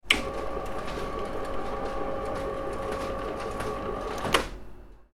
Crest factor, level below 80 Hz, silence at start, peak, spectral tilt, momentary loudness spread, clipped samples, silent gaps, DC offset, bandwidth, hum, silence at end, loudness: 28 dB; -42 dBFS; 0.05 s; -2 dBFS; -3.5 dB/octave; 8 LU; under 0.1%; none; under 0.1%; 16.5 kHz; none; 0.1 s; -31 LUFS